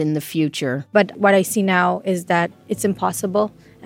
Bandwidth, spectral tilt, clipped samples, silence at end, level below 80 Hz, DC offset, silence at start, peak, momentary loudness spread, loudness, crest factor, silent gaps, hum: 17 kHz; -5 dB/octave; under 0.1%; 0 s; -62 dBFS; under 0.1%; 0 s; 0 dBFS; 7 LU; -19 LUFS; 18 dB; none; none